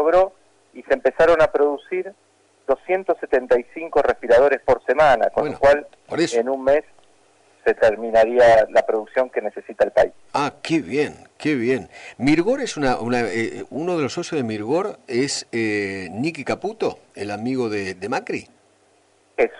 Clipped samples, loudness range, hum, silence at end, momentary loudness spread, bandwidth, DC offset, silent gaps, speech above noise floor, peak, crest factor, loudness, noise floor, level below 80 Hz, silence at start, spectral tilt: under 0.1%; 6 LU; none; 0 s; 11 LU; 11 kHz; under 0.1%; none; 39 dB; -8 dBFS; 12 dB; -20 LUFS; -59 dBFS; -48 dBFS; 0 s; -5 dB/octave